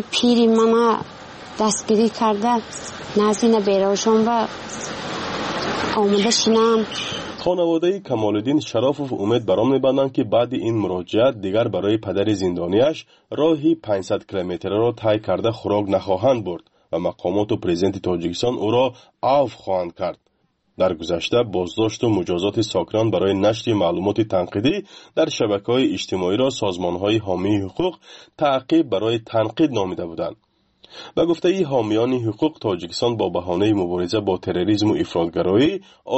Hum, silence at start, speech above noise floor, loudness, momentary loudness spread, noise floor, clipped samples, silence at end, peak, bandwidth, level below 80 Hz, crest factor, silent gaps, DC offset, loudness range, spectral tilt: none; 0 s; 46 dB; -20 LUFS; 8 LU; -66 dBFS; under 0.1%; 0 s; -6 dBFS; 8.4 kHz; -54 dBFS; 14 dB; none; under 0.1%; 3 LU; -5.5 dB/octave